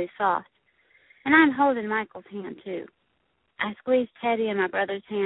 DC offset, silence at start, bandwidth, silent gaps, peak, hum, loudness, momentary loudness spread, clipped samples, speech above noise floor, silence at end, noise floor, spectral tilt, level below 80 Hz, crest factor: under 0.1%; 0 s; 4.1 kHz; none; -4 dBFS; none; -24 LUFS; 18 LU; under 0.1%; 47 dB; 0 s; -72 dBFS; -9.5 dB/octave; -68 dBFS; 22 dB